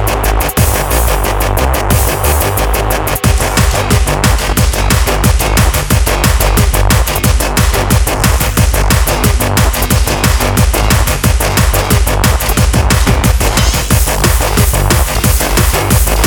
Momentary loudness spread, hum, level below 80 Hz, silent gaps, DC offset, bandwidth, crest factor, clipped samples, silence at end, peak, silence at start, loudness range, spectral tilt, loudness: 2 LU; none; -14 dBFS; none; under 0.1%; over 20 kHz; 10 dB; under 0.1%; 0 s; 0 dBFS; 0 s; 1 LU; -4 dB/octave; -11 LUFS